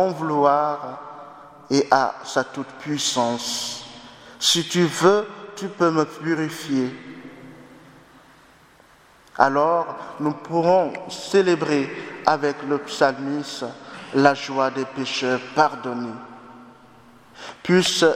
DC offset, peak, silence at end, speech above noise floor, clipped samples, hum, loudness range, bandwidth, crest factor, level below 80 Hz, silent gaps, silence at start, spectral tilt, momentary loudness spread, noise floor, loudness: under 0.1%; 0 dBFS; 0 s; 31 dB; under 0.1%; none; 5 LU; 16 kHz; 22 dB; -66 dBFS; none; 0 s; -4 dB/octave; 20 LU; -52 dBFS; -22 LUFS